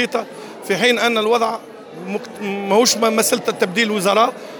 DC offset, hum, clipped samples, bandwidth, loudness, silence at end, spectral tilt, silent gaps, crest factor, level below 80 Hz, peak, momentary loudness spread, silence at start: under 0.1%; none; under 0.1%; over 20 kHz; -17 LUFS; 0 s; -2.5 dB/octave; none; 16 dB; -72 dBFS; -2 dBFS; 15 LU; 0 s